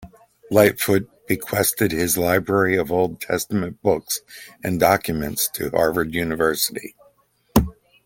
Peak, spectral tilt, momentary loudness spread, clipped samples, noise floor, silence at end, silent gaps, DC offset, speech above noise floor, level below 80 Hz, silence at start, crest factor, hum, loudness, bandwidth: -2 dBFS; -4.5 dB/octave; 9 LU; under 0.1%; -59 dBFS; 0.35 s; none; under 0.1%; 38 dB; -42 dBFS; 0 s; 20 dB; none; -21 LUFS; 17 kHz